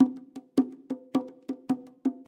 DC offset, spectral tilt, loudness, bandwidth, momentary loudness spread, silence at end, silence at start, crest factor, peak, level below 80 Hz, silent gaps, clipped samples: under 0.1%; -7 dB/octave; -31 LUFS; 10 kHz; 11 LU; 0.1 s; 0 s; 20 dB; -10 dBFS; -80 dBFS; none; under 0.1%